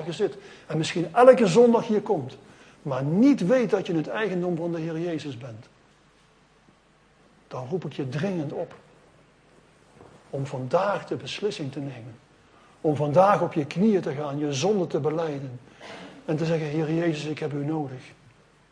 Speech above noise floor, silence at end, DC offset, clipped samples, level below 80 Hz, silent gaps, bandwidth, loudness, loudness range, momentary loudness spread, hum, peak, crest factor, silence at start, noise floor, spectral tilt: 35 dB; 0.6 s; under 0.1%; under 0.1%; -66 dBFS; none; 10.5 kHz; -24 LUFS; 13 LU; 19 LU; none; -2 dBFS; 24 dB; 0 s; -59 dBFS; -6.5 dB/octave